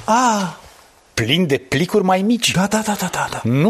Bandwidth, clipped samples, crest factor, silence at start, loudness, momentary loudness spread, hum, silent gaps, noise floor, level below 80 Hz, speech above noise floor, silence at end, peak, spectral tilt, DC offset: 14 kHz; under 0.1%; 16 dB; 0 s; -18 LUFS; 7 LU; none; none; -48 dBFS; -48 dBFS; 31 dB; 0 s; -2 dBFS; -4.5 dB/octave; under 0.1%